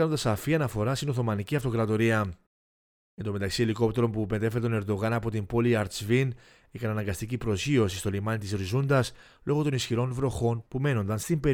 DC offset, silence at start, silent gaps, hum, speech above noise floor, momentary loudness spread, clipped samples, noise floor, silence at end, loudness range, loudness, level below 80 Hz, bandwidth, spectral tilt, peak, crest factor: under 0.1%; 0 s; 2.47-3.17 s; none; over 63 dB; 7 LU; under 0.1%; under -90 dBFS; 0 s; 1 LU; -28 LUFS; -50 dBFS; 18.5 kHz; -6 dB/octave; -10 dBFS; 16 dB